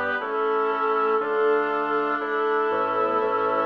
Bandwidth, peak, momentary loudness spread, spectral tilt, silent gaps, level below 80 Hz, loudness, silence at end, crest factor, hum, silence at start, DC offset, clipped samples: 5.6 kHz; -12 dBFS; 2 LU; -6 dB/octave; none; -72 dBFS; -23 LUFS; 0 s; 12 dB; none; 0 s; under 0.1%; under 0.1%